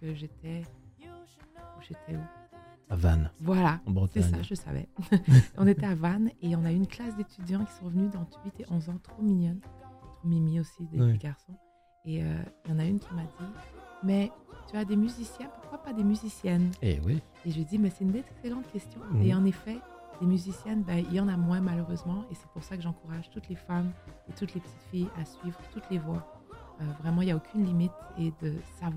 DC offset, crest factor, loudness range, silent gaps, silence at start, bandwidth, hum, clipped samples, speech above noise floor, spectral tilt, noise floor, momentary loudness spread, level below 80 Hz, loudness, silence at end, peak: under 0.1%; 22 dB; 10 LU; none; 0 s; 13.5 kHz; none; under 0.1%; 22 dB; -8 dB/octave; -52 dBFS; 17 LU; -46 dBFS; -30 LUFS; 0 s; -8 dBFS